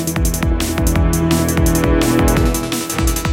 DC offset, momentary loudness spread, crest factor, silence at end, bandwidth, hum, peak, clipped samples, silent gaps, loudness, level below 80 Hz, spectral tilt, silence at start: under 0.1%; 4 LU; 14 dB; 0 s; 17 kHz; none; -2 dBFS; under 0.1%; none; -16 LUFS; -20 dBFS; -5 dB/octave; 0 s